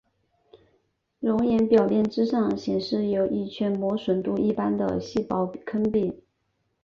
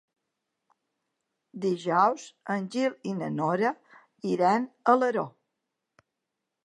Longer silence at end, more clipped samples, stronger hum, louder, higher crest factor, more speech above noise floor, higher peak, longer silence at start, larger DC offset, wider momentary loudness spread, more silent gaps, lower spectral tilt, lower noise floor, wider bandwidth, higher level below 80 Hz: second, 0.65 s vs 1.35 s; neither; neither; about the same, -25 LUFS vs -27 LUFS; about the same, 18 dB vs 22 dB; second, 50 dB vs 58 dB; about the same, -8 dBFS vs -8 dBFS; second, 0.55 s vs 1.55 s; neither; second, 8 LU vs 13 LU; neither; first, -8 dB/octave vs -6.5 dB/octave; second, -74 dBFS vs -85 dBFS; second, 7 kHz vs 11 kHz; first, -58 dBFS vs -84 dBFS